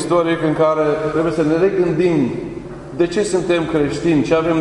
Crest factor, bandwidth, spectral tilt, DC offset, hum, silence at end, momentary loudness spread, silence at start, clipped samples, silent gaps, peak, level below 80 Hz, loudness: 14 dB; 11 kHz; -6.5 dB/octave; under 0.1%; none; 0 s; 6 LU; 0 s; under 0.1%; none; -2 dBFS; -44 dBFS; -17 LUFS